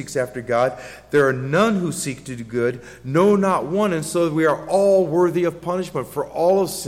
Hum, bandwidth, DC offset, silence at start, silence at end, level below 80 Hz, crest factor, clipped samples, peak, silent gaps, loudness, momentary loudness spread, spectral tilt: none; 16.5 kHz; under 0.1%; 0 s; 0 s; -54 dBFS; 14 dB; under 0.1%; -6 dBFS; none; -20 LUFS; 10 LU; -5.5 dB/octave